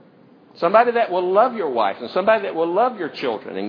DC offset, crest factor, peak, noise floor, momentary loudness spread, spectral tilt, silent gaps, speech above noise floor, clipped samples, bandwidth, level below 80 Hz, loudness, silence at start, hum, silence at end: under 0.1%; 18 dB; 0 dBFS; -50 dBFS; 9 LU; -7.5 dB/octave; none; 31 dB; under 0.1%; 5.4 kHz; -76 dBFS; -19 LUFS; 0.55 s; none; 0 s